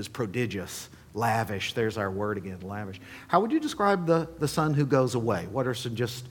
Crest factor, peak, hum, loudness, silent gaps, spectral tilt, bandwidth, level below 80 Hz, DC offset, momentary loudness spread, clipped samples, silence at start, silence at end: 22 dB; -6 dBFS; none; -28 LUFS; none; -6 dB/octave; 19 kHz; -58 dBFS; under 0.1%; 13 LU; under 0.1%; 0 s; 0 s